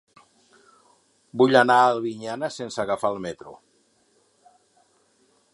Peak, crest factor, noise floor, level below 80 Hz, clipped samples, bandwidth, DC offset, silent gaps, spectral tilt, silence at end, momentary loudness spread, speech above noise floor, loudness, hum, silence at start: -2 dBFS; 24 dB; -64 dBFS; -68 dBFS; under 0.1%; 11.5 kHz; under 0.1%; none; -5 dB/octave; 2 s; 18 LU; 43 dB; -22 LUFS; none; 1.35 s